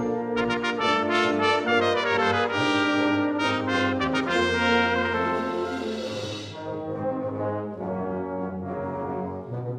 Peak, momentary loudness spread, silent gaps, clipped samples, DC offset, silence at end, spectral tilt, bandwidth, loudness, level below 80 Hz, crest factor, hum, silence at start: -8 dBFS; 10 LU; none; under 0.1%; under 0.1%; 0 s; -5 dB/octave; 11 kHz; -25 LUFS; -56 dBFS; 18 dB; none; 0 s